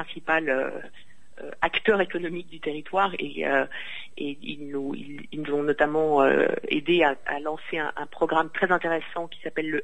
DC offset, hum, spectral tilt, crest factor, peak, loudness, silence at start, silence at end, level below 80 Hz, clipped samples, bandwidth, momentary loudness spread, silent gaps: 1%; none; -6 dB/octave; 20 dB; -6 dBFS; -26 LUFS; 0 s; 0 s; -56 dBFS; under 0.1%; 9.2 kHz; 13 LU; none